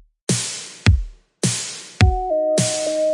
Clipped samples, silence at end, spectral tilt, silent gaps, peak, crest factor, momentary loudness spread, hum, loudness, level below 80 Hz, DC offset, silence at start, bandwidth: under 0.1%; 0 s; -4.5 dB/octave; none; 0 dBFS; 20 dB; 7 LU; none; -20 LUFS; -28 dBFS; under 0.1%; 0.3 s; 11.5 kHz